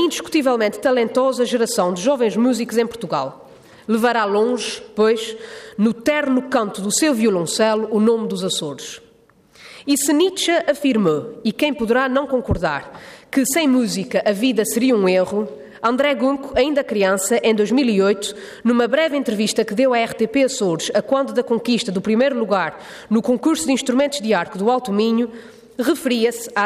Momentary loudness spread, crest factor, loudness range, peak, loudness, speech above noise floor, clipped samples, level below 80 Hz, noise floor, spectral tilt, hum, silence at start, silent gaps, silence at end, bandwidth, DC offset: 7 LU; 12 dB; 2 LU; -6 dBFS; -19 LUFS; 35 dB; under 0.1%; -50 dBFS; -53 dBFS; -4 dB/octave; none; 0 s; none; 0 s; 15.5 kHz; under 0.1%